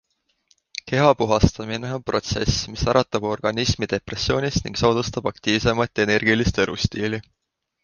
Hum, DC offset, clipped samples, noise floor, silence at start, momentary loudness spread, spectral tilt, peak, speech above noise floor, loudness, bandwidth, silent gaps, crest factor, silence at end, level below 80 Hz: none; under 0.1%; under 0.1%; -64 dBFS; 0.85 s; 9 LU; -5 dB/octave; -2 dBFS; 43 dB; -22 LUFS; 10 kHz; none; 20 dB; 0.65 s; -36 dBFS